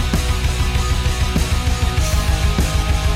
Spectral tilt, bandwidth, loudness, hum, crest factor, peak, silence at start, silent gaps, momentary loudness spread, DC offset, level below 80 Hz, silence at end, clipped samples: -4.5 dB/octave; 16 kHz; -19 LUFS; none; 12 dB; -6 dBFS; 0 s; none; 1 LU; 0.3%; -18 dBFS; 0 s; under 0.1%